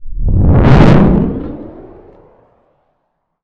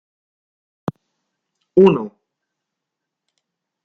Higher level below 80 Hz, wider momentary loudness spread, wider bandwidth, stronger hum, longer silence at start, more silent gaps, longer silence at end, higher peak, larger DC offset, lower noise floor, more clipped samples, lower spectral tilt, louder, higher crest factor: first, -18 dBFS vs -62 dBFS; first, 21 LU vs 18 LU; first, 7.4 kHz vs 4.3 kHz; neither; second, 0 s vs 1.75 s; neither; second, 1.6 s vs 1.75 s; about the same, 0 dBFS vs -2 dBFS; neither; second, -67 dBFS vs -82 dBFS; neither; about the same, -9.5 dB/octave vs -9 dB/octave; first, -9 LUFS vs -15 LUFS; second, 10 dB vs 20 dB